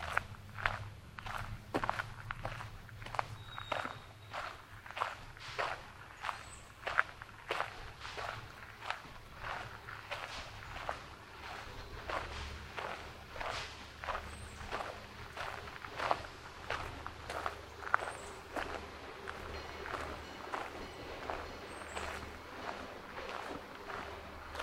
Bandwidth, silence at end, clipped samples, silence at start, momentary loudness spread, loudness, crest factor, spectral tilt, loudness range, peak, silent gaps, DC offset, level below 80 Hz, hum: 16 kHz; 0 s; under 0.1%; 0 s; 10 LU; -43 LUFS; 34 dB; -4 dB/octave; 4 LU; -10 dBFS; none; under 0.1%; -56 dBFS; none